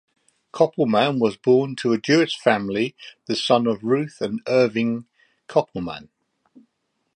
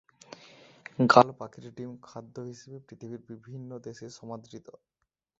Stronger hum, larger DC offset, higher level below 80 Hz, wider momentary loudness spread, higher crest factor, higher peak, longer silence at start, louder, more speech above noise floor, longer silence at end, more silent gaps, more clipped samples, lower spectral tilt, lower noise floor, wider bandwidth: neither; neither; first, -62 dBFS vs -72 dBFS; second, 12 LU vs 28 LU; second, 20 dB vs 30 dB; about the same, -2 dBFS vs -2 dBFS; second, 0.55 s vs 1 s; about the same, -21 LUFS vs -22 LUFS; first, 53 dB vs 25 dB; first, 1.1 s vs 0.8 s; neither; neither; about the same, -5.5 dB/octave vs -4.5 dB/octave; first, -74 dBFS vs -55 dBFS; first, 10.5 kHz vs 8 kHz